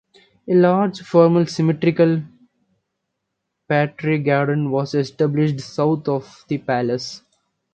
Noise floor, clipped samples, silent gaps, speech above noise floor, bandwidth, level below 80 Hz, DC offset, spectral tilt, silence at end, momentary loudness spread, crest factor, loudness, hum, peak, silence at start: -77 dBFS; under 0.1%; none; 59 dB; 8.6 kHz; -62 dBFS; under 0.1%; -7.5 dB/octave; 0.55 s; 11 LU; 18 dB; -19 LUFS; none; 0 dBFS; 0.45 s